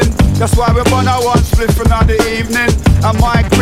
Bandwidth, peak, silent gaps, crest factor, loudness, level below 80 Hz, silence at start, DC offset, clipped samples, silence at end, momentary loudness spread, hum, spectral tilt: 16 kHz; 0 dBFS; none; 10 dB; -12 LUFS; -16 dBFS; 0 s; 1%; 0.2%; 0 s; 2 LU; none; -5.5 dB/octave